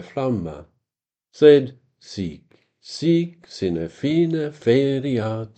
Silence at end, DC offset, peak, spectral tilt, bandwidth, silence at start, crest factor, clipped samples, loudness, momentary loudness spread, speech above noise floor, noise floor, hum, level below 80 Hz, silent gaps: 0.1 s; under 0.1%; -2 dBFS; -7.5 dB/octave; 8.6 kHz; 0 s; 20 dB; under 0.1%; -20 LUFS; 20 LU; 68 dB; -88 dBFS; none; -56 dBFS; none